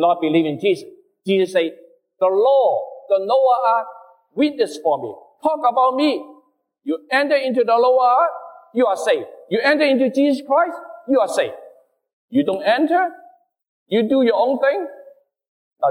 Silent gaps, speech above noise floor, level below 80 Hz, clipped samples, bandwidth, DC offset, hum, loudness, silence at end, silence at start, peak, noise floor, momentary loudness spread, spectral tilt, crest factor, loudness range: 12.13-12.28 s, 13.68-13.86 s, 15.48-15.71 s; 39 dB; -72 dBFS; under 0.1%; 12.5 kHz; under 0.1%; none; -18 LUFS; 0 s; 0 s; -4 dBFS; -56 dBFS; 11 LU; -5 dB/octave; 14 dB; 3 LU